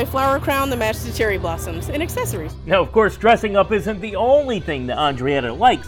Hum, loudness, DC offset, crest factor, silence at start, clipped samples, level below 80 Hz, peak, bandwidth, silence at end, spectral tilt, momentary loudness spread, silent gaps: none; -19 LUFS; under 0.1%; 16 dB; 0 s; under 0.1%; -34 dBFS; -2 dBFS; 19 kHz; 0 s; -5 dB/octave; 9 LU; none